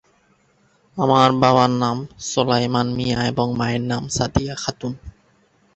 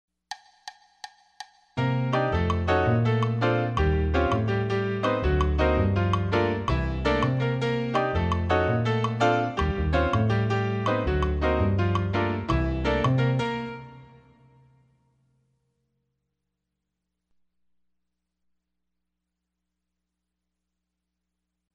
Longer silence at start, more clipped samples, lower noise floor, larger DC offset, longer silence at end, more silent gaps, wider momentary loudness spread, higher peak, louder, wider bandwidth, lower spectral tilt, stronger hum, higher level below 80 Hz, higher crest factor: first, 0.95 s vs 0.3 s; neither; second, -60 dBFS vs -83 dBFS; neither; second, 0.65 s vs 7.7 s; neither; second, 12 LU vs 17 LU; first, -2 dBFS vs -8 dBFS; first, -20 LUFS vs -25 LUFS; about the same, 8.4 kHz vs 8.6 kHz; second, -5 dB/octave vs -7.5 dB/octave; neither; second, -44 dBFS vs -36 dBFS; about the same, 20 dB vs 18 dB